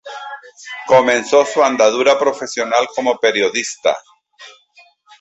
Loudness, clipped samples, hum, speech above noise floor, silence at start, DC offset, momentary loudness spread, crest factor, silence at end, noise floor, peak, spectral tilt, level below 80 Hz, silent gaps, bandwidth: -15 LUFS; under 0.1%; none; 36 dB; 0.05 s; under 0.1%; 18 LU; 16 dB; 0.7 s; -50 dBFS; -2 dBFS; -2.5 dB/octave; -62 dBFS; none; 8.4 kHz